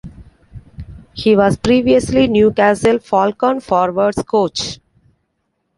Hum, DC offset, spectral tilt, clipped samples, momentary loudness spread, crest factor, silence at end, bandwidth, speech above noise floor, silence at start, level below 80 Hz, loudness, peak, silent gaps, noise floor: none; under 0.1%; -5.5 dB/octave; under 0.1%; 19 LU; 14 dB; 1.05 s; 11.5 kHz; 55 dB; 0.05 s; -40 dBFS; -14 LUFS; -2 dBFS; none; -69 dBFS